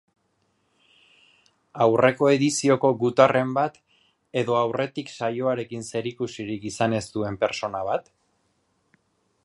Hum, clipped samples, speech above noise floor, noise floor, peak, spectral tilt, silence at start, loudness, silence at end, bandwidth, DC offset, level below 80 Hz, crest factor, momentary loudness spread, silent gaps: none; under 0.1%; 47 dB; -70 dBFS; -2 dBFS; -5 dB/octave; 1.75 s; -24 LUFS; 1.45 s; 11.5 kHz; under 0.1%; -62 dBFS; 24 dB; 12 LU; none